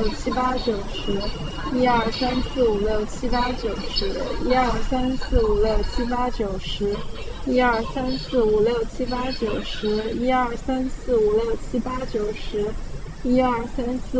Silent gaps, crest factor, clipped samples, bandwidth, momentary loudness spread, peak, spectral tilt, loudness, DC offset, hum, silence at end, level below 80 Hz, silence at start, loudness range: none; 18 dB; under 0.1%; 8 kHz; 7 LU; -6 dBFS; -6 dB/octave; -24 LUFS; under 0.1%; none; 0 s; -32 dBFS; 0 s; 1 LU